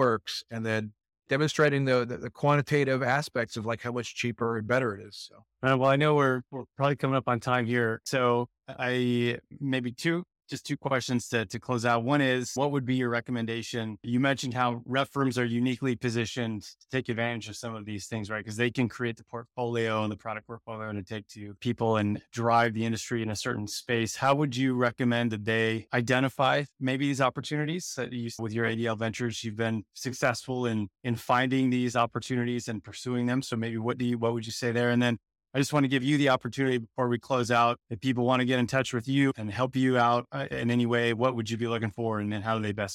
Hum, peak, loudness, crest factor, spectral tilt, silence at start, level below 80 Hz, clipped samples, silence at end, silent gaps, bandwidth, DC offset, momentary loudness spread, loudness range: none; -12 dBFS; -28 LUFS; 16 dB; -5.5 dB/octave; 0 s; -66 dBFS; under 0.1%; 0 s; none; 15.5 kHz; under 0.1%; 10 LU; 5 LU